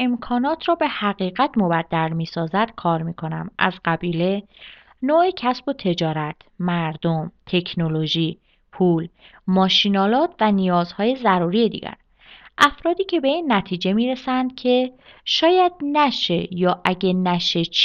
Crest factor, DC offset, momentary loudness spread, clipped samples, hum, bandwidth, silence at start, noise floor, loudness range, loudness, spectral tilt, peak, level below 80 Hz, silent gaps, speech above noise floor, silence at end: 20 dB; under 0.1%; 8 LU; under 0.1%; none; 11 kHz; 0 s; -48 dBFS; 4 LU; -20 LUFS; -6 dB/octave; 0 dBFS; -54 dBFS; none; 28 dB; 0 s